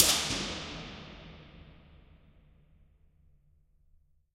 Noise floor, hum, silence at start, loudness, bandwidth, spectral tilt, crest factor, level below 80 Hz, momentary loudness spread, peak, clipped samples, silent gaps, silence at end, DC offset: -65 dBFS; none; 0 s; -31 LUFS; 16 kHz; -1 dB/octave; 34 dB; -56 dBFS; 27 LU; -2 dBFS; under 0.1%; none; 2.4 s; under 0.1%